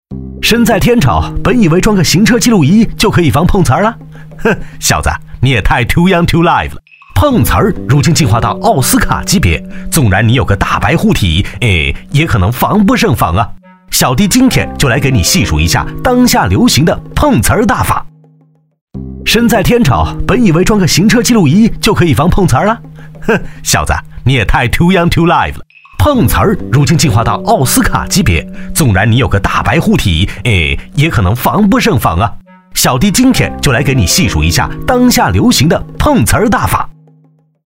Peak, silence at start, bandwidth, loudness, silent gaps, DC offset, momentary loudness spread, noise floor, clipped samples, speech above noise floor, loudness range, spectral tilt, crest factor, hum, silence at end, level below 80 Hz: 0 dBFS; 0.1 s; 16.5 kHz; -10 LUFS; 18.81-18.88 s; 0.7%; 6 LU; -48 dBFS; under 0.1%; 39 dB; 2 LU; -5 dB/octave; 10 dB; none; 0.75 s; -22 dBFS